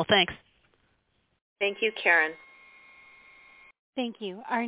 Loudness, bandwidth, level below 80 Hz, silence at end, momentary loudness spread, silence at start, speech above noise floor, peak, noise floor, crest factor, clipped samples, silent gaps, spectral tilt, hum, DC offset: -26 LUFS; 4 kHz; -66 dBFS; 0 s; 18 LU; 0 s; 45 dB; -8 dBFS; -72 dBFS; 22 dB; under 0.1%; 1.41-1.56 s, 3.79-3.93 s; -0.5 dB/octave; none; under 0.1%